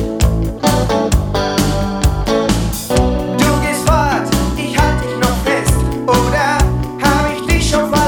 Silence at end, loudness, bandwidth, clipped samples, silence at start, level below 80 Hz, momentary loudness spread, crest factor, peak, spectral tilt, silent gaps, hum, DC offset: 0 s; -15 LUFS; 19 kHz; under 0.1%; 0 s; -20 dBFS; 3 LU; 14 dB; 0 dBFS; -5 dB/octave; none; none; under 0.1%